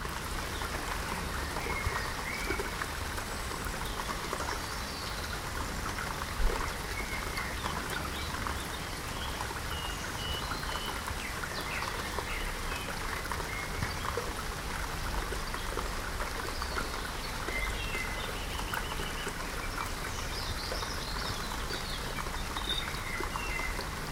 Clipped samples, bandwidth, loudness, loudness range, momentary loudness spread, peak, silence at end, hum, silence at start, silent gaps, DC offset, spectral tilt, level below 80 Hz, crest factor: under 0.1%; 17 kHz; -35 LUFS; 1 LU; 3 LU; -16 dBFS; 0 s; none; 0 s; none; under 0.1%; -3 dB/octave; -40 dBFS; 18 dB